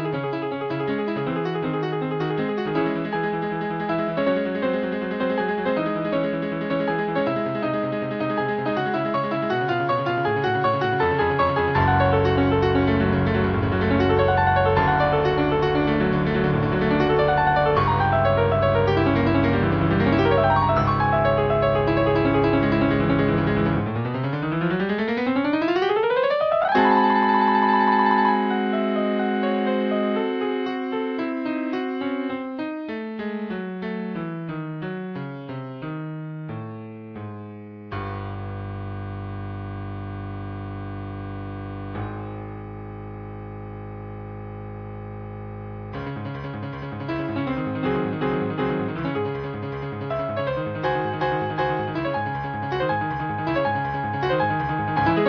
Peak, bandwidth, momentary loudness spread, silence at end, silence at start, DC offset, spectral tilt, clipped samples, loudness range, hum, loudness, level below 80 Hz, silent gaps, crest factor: -4 dBFS; 5.4 kHz; 14 LU; 0 s; 0 s; under 0.1%; -9 dB/octave; under 0.1%; 14 LU; none; -23 LUFS; -42 dBFS; none; 18 dB